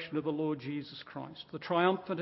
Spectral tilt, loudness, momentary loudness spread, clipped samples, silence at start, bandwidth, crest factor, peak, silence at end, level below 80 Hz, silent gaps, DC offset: -4.5 dB/octave; -34 LUFS; 15 LU; under 0.1%; 0 s; 5.8 kHz; 20 dB; -14 dBFS; 0 s; -76 dBFS; none; under 0.1%